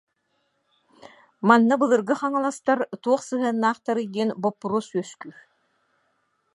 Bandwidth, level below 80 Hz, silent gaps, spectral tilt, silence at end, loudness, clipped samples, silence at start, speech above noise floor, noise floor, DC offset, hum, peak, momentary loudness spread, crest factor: 11.5 kHz; -78 dBFS; none; -5.5 dB/octave; 1.25 s; -23 LUFS; under 0.1%; 1.4 s; 49 dB; -72 dBFS; under 0.1%; none; -2 dBFS; 13 LU; 22 dB